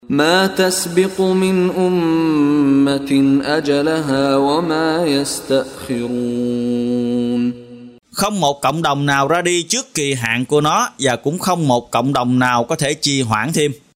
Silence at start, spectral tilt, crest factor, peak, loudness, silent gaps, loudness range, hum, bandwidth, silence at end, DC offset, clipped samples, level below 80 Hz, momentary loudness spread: 0.1 s; -4.5 dB/octave; 16 dB; 0 dBFS; -16 LUFS; none; 4 LU; none; 16 kHz; 0.2 s; under 0.1%; under 0.1%; -52 dBFS; 5 LU